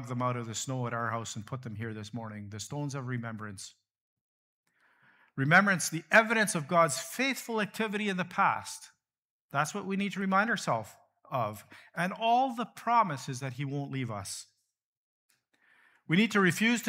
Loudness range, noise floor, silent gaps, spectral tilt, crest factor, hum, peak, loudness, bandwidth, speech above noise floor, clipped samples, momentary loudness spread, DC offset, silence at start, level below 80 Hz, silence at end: 12 LU; -68 dBFS; 4.01-4.64 s, 9.18-9.49 s, 14.84-15.29 s; -4.5 dB/octave; 24 dB; none; -8 dBFS; -30 LUFS; 16 kHz; 38 dB; under 0.1%; 17 LU; under 0.1%; 0 s; -78 dBFS; 0 s